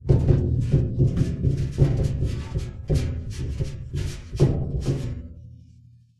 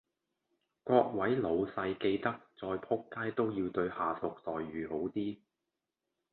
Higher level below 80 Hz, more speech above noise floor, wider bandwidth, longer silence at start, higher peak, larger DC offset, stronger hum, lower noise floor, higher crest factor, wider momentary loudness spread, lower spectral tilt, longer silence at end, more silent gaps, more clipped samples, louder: first, -30 dBFS vs -66 dBFS; second, 31 dB vs 54 dB; first, 11.5 kHz vs 4.4 kHz; second, 0 s vs 0.85 s; first, -6 dBFS vs -12 dBFS; neither; neither; second, -51 dBFS vs -88 dBFS; about the same, 18 dB vs 22 dB; about the same, 10 LU vs 10 LU; second, -8.5 dB/octave vs -10 dB/octave; second, 0.65 s vs 0.95 s; neither; neither; first, -25 LUFS vs -35 LUFS